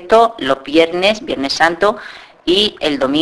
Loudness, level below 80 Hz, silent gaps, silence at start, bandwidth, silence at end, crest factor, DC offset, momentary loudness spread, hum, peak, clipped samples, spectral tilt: -14 LUFS; -46 dBFS; none; 0 s; 11 kHz; 0 s; 14 dB; under 0.1%; 8 LU; none; 0 dBFS; under 0.1%; -3.5 dB/octave